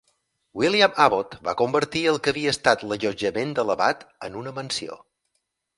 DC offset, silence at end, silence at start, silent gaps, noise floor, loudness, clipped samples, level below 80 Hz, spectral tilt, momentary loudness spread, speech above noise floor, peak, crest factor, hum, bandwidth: under 0.1%; 0.8 s; 0.55 s; none; -76 dBFS; -23 LUFS; under 0.1%; -58 dBFS; -4 dB/octave; 14 LU; 53 dB; -2 dBFS; 22 dB; none; 11.5 kHz